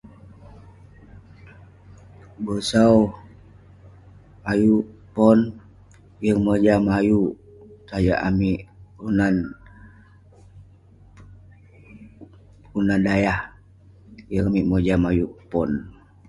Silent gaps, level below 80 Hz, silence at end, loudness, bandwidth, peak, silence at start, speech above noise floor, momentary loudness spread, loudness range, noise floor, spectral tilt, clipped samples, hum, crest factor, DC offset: none; -42 dBFS; 0.4 s; -21 LUFS; 11.5 kHz; -2 dBFS; 1.45 s; 31 dB; 15 LU; 8 LU; -50 dBFS; -7.5 dB/octave; under 0.1%; none; 22 dB; under 0.1%